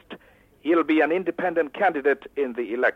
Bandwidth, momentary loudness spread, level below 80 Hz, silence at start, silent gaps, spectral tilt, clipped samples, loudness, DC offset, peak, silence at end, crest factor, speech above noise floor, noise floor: 5.4 kHz; 7 LU; -64 dBFS; 0.1 s; none; -7 dB/octave; under 0.1%; -23 LUFS; under 0.1%; -8 dBFS; 0 s; 14 dB; 29 dB; -52 dBFS